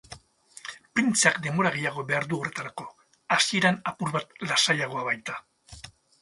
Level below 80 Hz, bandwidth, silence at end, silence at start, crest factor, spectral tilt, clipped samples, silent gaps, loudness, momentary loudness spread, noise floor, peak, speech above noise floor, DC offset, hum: -64 dBFS; 11.5 kHz; 0.35 s; 0.1 s; 24 dB; -3 dB/octave; under 0.1%; none; -25 LUFS; 20 LU; -52 dBFS; -4 dBFS; 26 dB; under 0.1%; none